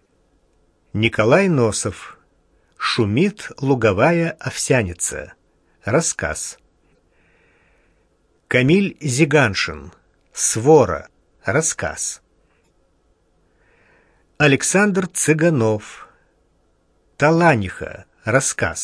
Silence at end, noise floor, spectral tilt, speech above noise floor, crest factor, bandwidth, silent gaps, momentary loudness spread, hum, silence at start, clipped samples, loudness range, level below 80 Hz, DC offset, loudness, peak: 0 s; -61 dBFS; -4.5 dB/octave; 44 dB; 20 dB; 11 kHz; none; 15 LU; none; 0.95 s; under 0.1%; 6 LU; -48 dBFS; under 0.1%; -18 LUFS; 0 dBFS